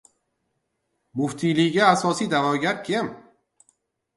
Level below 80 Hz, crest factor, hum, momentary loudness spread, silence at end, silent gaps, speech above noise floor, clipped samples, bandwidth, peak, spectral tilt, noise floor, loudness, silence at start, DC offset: -66 dBFS; 22 dB; none; 10 LU; 1 s; none; 54 dB; under 0.1%; 11.5 kHz; -2 dBFS; -5 dB/octave; -75 dBFS; -22 LUFS; 1.15 s; under 0.1%